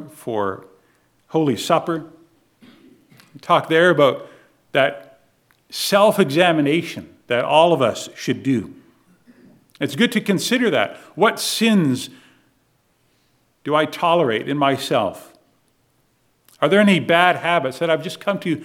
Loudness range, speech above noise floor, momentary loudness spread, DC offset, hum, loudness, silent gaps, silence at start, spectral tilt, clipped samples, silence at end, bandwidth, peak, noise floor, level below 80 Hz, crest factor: 4 LU; 45 dB; 13 LU; under 0.1%; none; -18 LUFS; none; 0 s; -5 dB/octave; under 0.1%; 0 s; 17.5 kHz; 0 dBFS; -63 dBFS; -70 dBFS; 20 dB